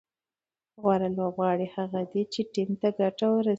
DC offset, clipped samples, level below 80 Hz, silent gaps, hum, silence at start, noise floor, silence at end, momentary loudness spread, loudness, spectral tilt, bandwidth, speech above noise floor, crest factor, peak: under 0.1%; under 0.1%; -70 dBFS; none; none; 0.8 s; under -90 dBFS; 0 s; 5 LU; -28 LUFS; -7.5 dB/octave; 8 kHz; over 63 dB; 18 dB; -10 dBFS